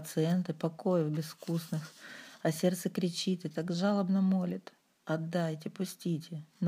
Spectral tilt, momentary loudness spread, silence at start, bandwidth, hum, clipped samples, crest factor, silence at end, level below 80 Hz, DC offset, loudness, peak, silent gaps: -6.5 dB/octave; 10 LU; 0 s; 15.5 kHz; none; under 0.1%; 18 dB; 0 s; -82 dBFS; under 0.1%; -33 LUFS; -16 dBFS; none